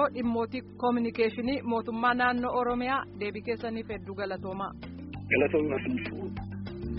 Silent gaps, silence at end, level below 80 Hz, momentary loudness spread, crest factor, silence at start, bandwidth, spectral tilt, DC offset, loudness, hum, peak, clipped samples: none; 0 s; -52 dBFS; 12 LU; 18 dB; 0 s; 5.6 kHz; -4.5 dB/octave; under 0.1%; -30 LUFS; none; -12 dBFS; under 0.1%